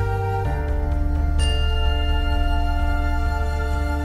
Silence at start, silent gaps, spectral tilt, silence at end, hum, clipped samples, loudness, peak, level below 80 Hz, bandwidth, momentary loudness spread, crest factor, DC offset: 0 s; none; -6 dB/octave; 0 s; none; under 0.1%; -23 LUFS; -8 dBFS; -20 dBFS; 11.5 kHz; 3 LU; 12 dB; under 0.1%